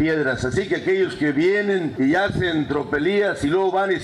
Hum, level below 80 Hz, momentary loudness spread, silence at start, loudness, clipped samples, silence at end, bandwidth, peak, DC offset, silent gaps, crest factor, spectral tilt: none; -48 dBFS; 3 LU; 0 s; -21 LUFS; under 0.1%; 0 s; 11 kHz; -12 dBFS; under 0.1%; none; 8 dB; -6 dB/octave